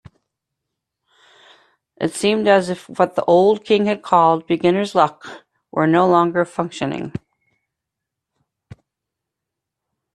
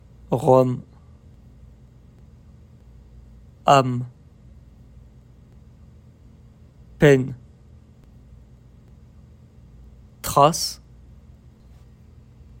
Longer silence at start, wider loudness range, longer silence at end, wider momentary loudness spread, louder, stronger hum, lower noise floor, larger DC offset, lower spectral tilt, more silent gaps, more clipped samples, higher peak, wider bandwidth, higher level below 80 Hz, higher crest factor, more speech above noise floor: first, 2 s vs 0.3 s; first, 10 LU vs 2 LU; first, 2.95 s vs 1.85 s; second, 13 LU vs 16 LU; first, -17 LUFS vs -20 LUFS; neither; first, -82 dBFS vs -49 dBFS; neither; about the same, -6 dB/octave vs -5.5 dB/octave; neither; neither; about the same, 0 dBFS vs -2 dBFS; second, 12.5 kHz vs 16 kHz; second, -62 dBFS vs -50 dBFS; about the same, 20 dB vs 24 dB; first, 65 dB vs 31 dB